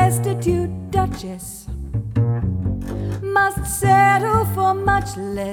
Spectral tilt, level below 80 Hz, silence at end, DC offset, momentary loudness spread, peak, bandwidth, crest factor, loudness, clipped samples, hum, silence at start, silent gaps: -6 dB/octave; -34 dBFS; 0 s; under 0.1%; 13 LU; -4 dBFS; 19.5 kHz; 16 dB; -20 LUFS; under 0.1%; none; 0 s; none